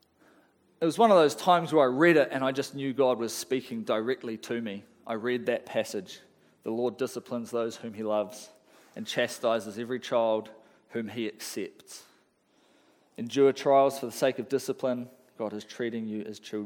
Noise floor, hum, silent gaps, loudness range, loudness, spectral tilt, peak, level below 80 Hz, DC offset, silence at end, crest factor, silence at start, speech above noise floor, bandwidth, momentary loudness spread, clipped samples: -67 dBFS; none; none; 9 LU; -28 LUFS; -4.5 dB/octave; -8 dBFS; -82 dBFS; under 0.1%; 0 s; 20 dB; 0.8 s; 39 dB; 19 kHz; 17 LU; under 0.1%